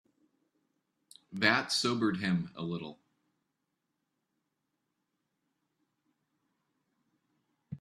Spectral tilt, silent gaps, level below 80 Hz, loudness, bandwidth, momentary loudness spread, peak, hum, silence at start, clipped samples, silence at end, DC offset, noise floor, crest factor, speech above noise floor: -4 dB/octave; none; -76 dBFS; -31 LUFS; 12.5 kHz; 19 LU; -10 dBFS; none; 1.3 s; under 0.1%; 0.05 s; under 0.1%; -84 dBFS; 28 dB; 52 dB